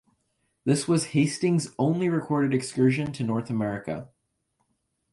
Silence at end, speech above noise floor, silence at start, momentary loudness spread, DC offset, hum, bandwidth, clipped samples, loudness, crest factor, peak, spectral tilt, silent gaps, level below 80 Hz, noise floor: 1.05 s; 50 dB; 0.65 s; 8 LU; under 0.1%; none; 11.5 kHz; under 0.1%; -26 LUFS; 16 dB; -10 dBFS; -6 dB/octave; none; -62 dBFS; -75 dBFS